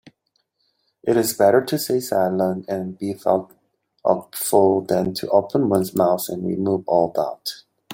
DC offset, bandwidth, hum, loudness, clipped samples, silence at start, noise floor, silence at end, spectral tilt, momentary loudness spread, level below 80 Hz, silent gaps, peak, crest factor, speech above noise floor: under 0.1%; 17 kHz; none; -21 LUFS; under 0.1%; 0.05 s; -70 dBFS; 0 s; -5.5 dB/octave; 10 LU; -62 dBFS; none; -2 dBFS; 18 dB; 50 dB